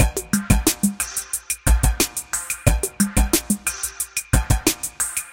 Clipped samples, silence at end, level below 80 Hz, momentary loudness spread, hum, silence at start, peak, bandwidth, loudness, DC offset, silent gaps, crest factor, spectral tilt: under 0.1%; 0 s; -24 dBFS; 7 LU; none; 0 s; 0 dBFS; 17 kHz; -21 LUFS; under 0.1%; none; 20 dB; -3.5 dB/octave